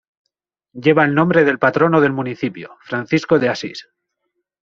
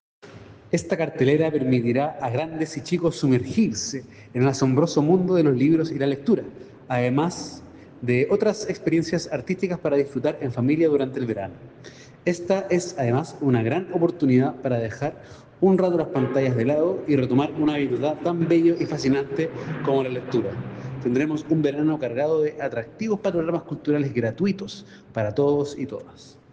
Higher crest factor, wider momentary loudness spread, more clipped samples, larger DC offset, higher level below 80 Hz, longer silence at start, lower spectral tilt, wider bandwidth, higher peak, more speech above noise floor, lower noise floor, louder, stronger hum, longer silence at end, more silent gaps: about the same, 16 dB vs 16 dB; about the same, 12 LU vs 10 LU; neither; neither; about the same, -58 dBFS vs -58 dBFS; first, 0.75 s vs 0.25 s; about the same, -7 dB/octave vs -7 dB/octave; second, 7.6 kHz vs 9.4 kHz; first, -2 dBFS vs -6 dBFS; first, 58 dB vs 22 dB; first, -74 dBFS vs -44 dBFS; first, -16 LUFS vs -23 LUFS; neither; first, 0.85 s vs 0.2 s; neither